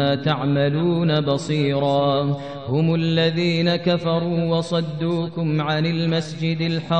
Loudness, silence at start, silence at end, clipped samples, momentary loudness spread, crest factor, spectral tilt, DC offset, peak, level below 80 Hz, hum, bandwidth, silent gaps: -21 LUFS; 0 s; 0 s; under 0.1%; 4 LU; 14 dB; -7 dB/octave; 0.3%; -6 dBFS; -58 dBFS; none; 8.8 kHz; none